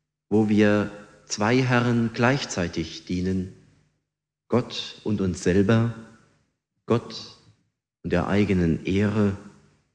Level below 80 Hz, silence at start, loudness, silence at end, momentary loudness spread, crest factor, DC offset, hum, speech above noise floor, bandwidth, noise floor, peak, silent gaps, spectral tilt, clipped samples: -50 dBFS; 0.3 s; -24 LUFS; 0.45 s; 13 LU; 20 dB; under 0.1%; none; 61 dB; 9.8 kHz; -84 dBFS; -6 dBFS; none; -6 dB/octave; under 0.1%